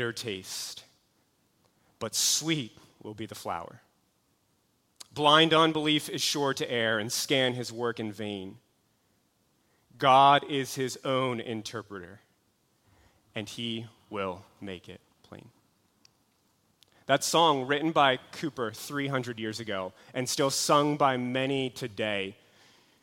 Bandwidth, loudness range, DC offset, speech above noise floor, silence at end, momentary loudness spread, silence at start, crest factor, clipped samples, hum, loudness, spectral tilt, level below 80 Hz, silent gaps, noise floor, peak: 16.5 kHz; 14 LU; under 0.1%; 43 dB; 0.7 s; 19 LU; 0 s; 24 dB; under 0.1%; none; -27 LUFS; -3 dB/octave; -72 dBFS; none; -71 dBFS; -6 dBFS